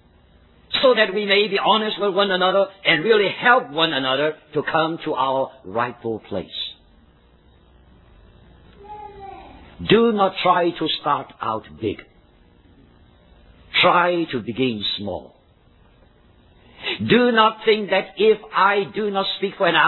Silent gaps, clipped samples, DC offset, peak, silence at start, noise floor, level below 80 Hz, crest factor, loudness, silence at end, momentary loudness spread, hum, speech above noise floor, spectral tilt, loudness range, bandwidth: none; under 0.1%; under 0.1%; -2 dBFS; 0.7 s; -54 dBFS; -56 dBFS; 20 dB; -19 LUFS; 0 s; 13 LU; none; 35 dB; -7.5 dB/octave; 10 LU; 4.3 kHz